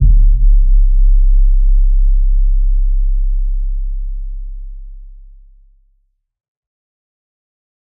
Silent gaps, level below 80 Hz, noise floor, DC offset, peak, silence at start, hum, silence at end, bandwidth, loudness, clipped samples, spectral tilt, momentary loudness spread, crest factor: none; -12 dBFS; -60 dBFS; under 0.1%; -2 dBFS; 0 s; none; 2.9 s; 0.3 kHz; -17 LUFS; under 0.1%; -25.5 dB/octave; 17 LU; 10 dB